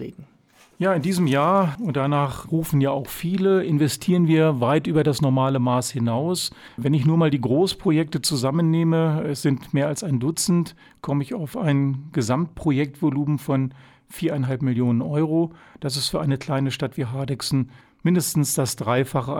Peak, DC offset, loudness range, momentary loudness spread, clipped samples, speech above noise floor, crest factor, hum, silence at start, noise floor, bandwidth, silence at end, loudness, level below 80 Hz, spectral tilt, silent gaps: -8 dBFS; under 0.1%; 4 LU; 7 LU; under 0.1%; 34 dB; 14 dB; none; 0 s; -56 dBFS; 18 kHz; 0 s; -22 LUFS; -54 dBFS; -6 dB/octave; none